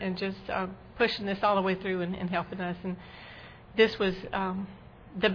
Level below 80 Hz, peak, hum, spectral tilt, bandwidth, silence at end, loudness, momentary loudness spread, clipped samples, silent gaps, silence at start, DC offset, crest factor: -56 dBFS; -12 dBFS; none; -7 dB/octave; 5.4 kHz; 0 s; -30 LUFS; 19 LU; under 0.1%; none; 0 s; under 0.1%; 20 dB